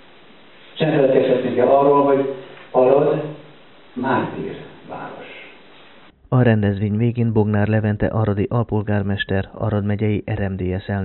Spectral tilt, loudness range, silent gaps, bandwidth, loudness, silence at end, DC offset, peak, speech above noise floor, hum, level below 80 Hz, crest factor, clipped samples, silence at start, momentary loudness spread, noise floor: -7 dB/octave; 6 LU; none; 4.2 kHz; -19 LUFS; 0 s; under 0.1%; -2 dBFS; 29 dB; none; -46 dBFS; 18 dB; under 0.1%; 0.75 s; 19 LU; -47 dBFS